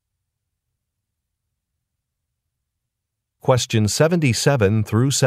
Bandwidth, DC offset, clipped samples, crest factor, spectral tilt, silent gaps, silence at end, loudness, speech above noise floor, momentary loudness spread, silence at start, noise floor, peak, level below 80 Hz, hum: 16 kHz; under 0.1%; under 0.1%; 20 dB; -5 dB/octave; none; 0 s; -18 LUFS; 63 dB; 3 LU; 3.45 s; -80 dBFS; -2 dBFS; -54 dBFS; none